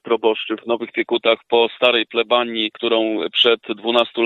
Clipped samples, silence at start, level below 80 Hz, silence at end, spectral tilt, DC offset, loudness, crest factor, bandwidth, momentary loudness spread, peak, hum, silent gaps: under 0.1%; 0.05 s; -74 dBFS; 0 s; -5 dB/octave; under 0.1%; -18 LUFS; 18 dB; 6.8 kHz; 7 LU; 0 dBFS; none; none